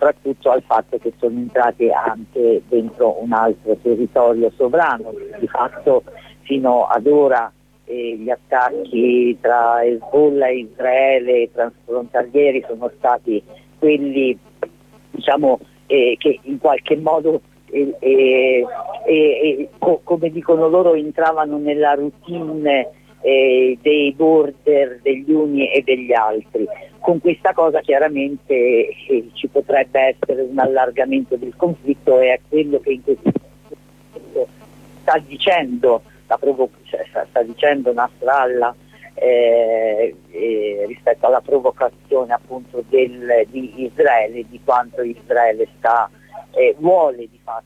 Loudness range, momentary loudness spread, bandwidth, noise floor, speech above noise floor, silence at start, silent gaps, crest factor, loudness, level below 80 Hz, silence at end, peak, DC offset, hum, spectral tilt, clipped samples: 3 LU; 10 LU; 7.8 kHz; -43 dBFS; 27 dB; 0 s; none; 14 dB; -17 LUFS; -56 dBFS; 0.05 s; -4 dBFS; under 0.1%; 50 Hz at -50 dBFS; -7 dB/octave; under 0.1%